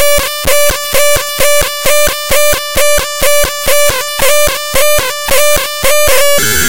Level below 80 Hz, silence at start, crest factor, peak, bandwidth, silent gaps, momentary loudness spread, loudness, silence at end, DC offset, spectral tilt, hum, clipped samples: -26 dBFS; 0 s; 10 dB; 0 dBFS; over 20 kHz; none; 3 LU; -9 LUFS; 0 s; 20%; -1 dB/octave; none; 0.5%